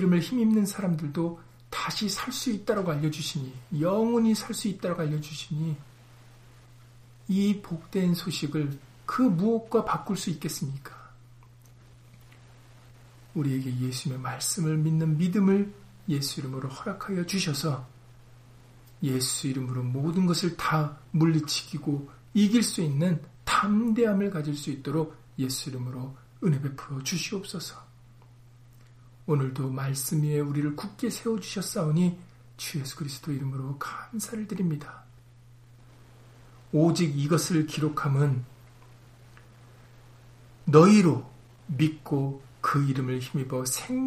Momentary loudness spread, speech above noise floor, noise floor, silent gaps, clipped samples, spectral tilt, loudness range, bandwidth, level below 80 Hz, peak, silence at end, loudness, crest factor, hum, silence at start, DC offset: 11 LU; 26 dB; -53 dBFS; none; under 0.1%; -5.5 dB/octave; 9 LU; 15.5 kHz; -60 dBFS; -4 dBFS; 0 s; -28 LUFS; 24 dB; none; 0 s; under 0.1%